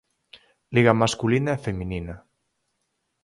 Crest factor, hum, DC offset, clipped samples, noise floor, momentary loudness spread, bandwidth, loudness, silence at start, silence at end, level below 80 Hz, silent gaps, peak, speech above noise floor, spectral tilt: 22 dB; none; under 0.1%; under 0.1%; -76 dBFS; 16 LU; 11.5 kHz; -23 LUFS; 0.7 s; 1.05 s; -48 dBFS; none; -2 dBFS; 54 dB; -6 dB/octave